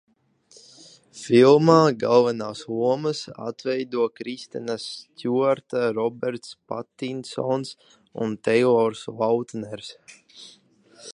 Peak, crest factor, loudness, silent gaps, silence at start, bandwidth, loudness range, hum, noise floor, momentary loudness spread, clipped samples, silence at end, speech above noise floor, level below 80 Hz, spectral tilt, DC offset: -2 dBFS; 22 dB; -23 LUFS; none; 1.15 s; 11 kHz; 7 LU; none; -57 dBFS; 18 LU; under 0.1%; 0.05 s; 34 dB; -70 dBFS; -6 dB/octave; under 0.1%